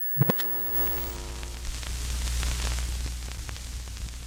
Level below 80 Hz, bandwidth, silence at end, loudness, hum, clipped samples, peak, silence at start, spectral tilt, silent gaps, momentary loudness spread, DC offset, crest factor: -34 dBFS; 16.5 kHz; 0 s; -29 LUFS; none; under 0.1%; -10 dBFS; 0 s; -4 dB/octave; none; 14 LU; under 0.1%; 20 dB